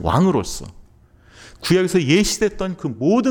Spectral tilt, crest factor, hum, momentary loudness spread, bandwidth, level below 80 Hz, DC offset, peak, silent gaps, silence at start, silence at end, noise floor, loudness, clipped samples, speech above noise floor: -5 dB/octave; 16 dB; none; 12 LU; 19 kHz; -40 dBFS; under 0.1%; -2 dBFS; none; 0 s; 0 s; -50 dBFS; -19 LUFS; under 0.1%; 32 dB